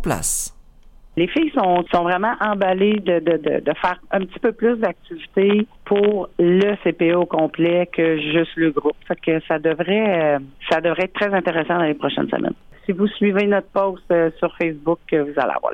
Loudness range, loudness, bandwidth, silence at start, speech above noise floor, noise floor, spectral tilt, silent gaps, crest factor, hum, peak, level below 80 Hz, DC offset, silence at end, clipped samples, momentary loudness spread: 2 LU; -19 LUFS; 16.5 kHz; 0 s; 26 dB; -45 dBFS; -5 dB/octave; none; 12 dB; none; -6 dBFS; -46 dBFS; under 0.1%; 0 s; under 0.1%; 6 LU